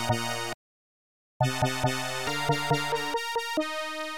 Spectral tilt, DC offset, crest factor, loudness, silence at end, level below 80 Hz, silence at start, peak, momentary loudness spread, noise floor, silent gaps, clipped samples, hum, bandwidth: -4 dB/octave; 0.8%; 18 dB; -29 LUFS; 0 s; -54 dBFS; 0 s; -12 dBFS; 6 LU; under -90 dBFS; 0.54-1.40 s; under 0.1%; none; 18 kHz